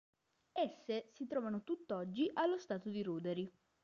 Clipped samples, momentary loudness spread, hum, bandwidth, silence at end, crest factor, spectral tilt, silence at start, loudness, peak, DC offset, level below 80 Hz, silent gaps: under 0.1%; 6 LU; none; 7.2 kHz; 0.35 s; 16 dB; -5 dB/octave; 0.55 s; -41 LUFS; -24 dBFS; under 0.1%; -84 dBFS; none